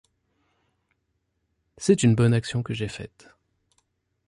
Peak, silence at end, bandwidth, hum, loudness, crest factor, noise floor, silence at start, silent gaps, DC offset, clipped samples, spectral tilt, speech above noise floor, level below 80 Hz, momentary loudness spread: -6 dBFS; 1.2 s; 11.5 kHz; none; -23 LUFS; 22 dB; -75 dBFS; 1.8 s; none; under 0.1%; under 0.1%; -6 dB/octave; 53 dB; -56 dBFS; 17 LU